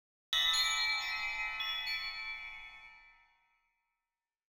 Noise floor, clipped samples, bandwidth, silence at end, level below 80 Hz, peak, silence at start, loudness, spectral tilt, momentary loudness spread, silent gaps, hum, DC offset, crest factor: under -90 dBFS; under 0.1%; over 20 kHz; 1.4 s; -62 dBFS; -20 dBFS; 0.3 s; -33 LUFS; 3 dB/octave; 18 LU; none; none; under 0.1%; 18 dB